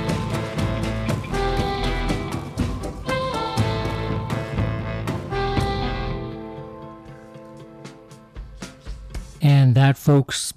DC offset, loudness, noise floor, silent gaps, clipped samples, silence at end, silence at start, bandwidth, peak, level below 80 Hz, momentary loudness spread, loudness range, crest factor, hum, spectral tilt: under 0.1%; -23 LUFS; -43 dBFS; none; under 0.1%; 0.05 s; 0 s; 14.5 kHz; -8 dBFS; -34 dBFS; 24 LU; 10 LU; 16 dB; none; -6 dB/octave